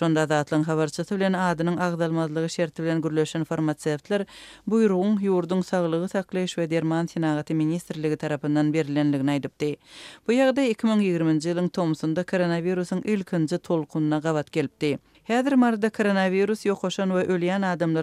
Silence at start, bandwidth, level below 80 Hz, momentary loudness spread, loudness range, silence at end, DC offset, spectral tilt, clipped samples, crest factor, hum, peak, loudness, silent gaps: 0 s; 13 kHz; -66 dBFS; 6 LU; 2 LU; 0 s; under 0.1%; -6.5 dB/octave; under 0.1%; 14 dB; none; -10 dBFS; -25 LUFS; none